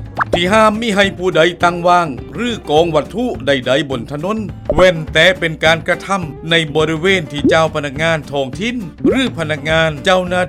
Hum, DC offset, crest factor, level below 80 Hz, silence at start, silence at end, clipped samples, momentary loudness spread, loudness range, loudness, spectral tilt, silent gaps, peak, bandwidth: none; under 0.1%; 14 dB; -36 dBFS; 0 s; 0 s; under 0.1%; 9 LU; 2 LU; -14 LUFS; -5 dB/octave; none; 0 dBFS; 15.5 kHz